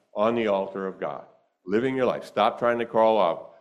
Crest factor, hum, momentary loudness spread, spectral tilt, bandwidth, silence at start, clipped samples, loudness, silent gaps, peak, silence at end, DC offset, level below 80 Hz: 18 dB; none; 11 LU; -6.5 dB/octave; 11 kHz; 0.15 s; under 0.1%; -25 LUFS; none; -6 dBFS; 0.15 s; under 0.1%; -68 dBFS